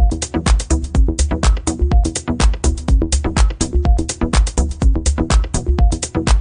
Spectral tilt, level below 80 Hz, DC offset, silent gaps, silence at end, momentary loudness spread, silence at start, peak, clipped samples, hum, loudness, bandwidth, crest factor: -5 dB/octave; -16 dBFS; under 0.1%; none; 0 s; 2 LU; 0 s; 0 dBFS; under 0.1%; none; -17 LUFS; 10 kHz; 14 dB